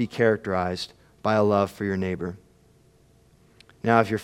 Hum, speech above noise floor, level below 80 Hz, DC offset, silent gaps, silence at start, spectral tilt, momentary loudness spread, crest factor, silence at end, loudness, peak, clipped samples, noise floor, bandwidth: none; 35 dB; -62 dBFS; under 0.1%; none; 0 s; -6.5 dB/octave; 13 LU; 24 dB; 0 s; -25 LUFS; -2 dBFS; under 0.1%; -58 dBFS; 15.5 kHz